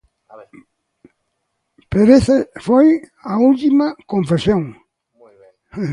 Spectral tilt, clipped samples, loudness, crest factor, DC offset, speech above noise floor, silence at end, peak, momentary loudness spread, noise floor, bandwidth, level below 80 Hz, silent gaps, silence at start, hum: -7.5 dB/octave; under 0.1%; -15 LUFS; 16 dB; under 0.1%; 58 dB; 0 s; 0 dBFS; 12 LU; -72 dBFS; 11 kHz; -44 dBFS; none; 0.35 s; none